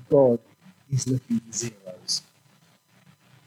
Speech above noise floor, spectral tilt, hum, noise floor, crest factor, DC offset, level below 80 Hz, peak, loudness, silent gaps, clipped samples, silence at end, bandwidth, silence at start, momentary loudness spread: 36 dB; -5.5 dB/octave; none; -60 dBFS; 20 dB; under 0.1%; -66 dBFS; -6 dBFS; -26 LUFS; none; under 0.1%; 1.25 s; 15.5 kHz; 0.1 s; 12 LU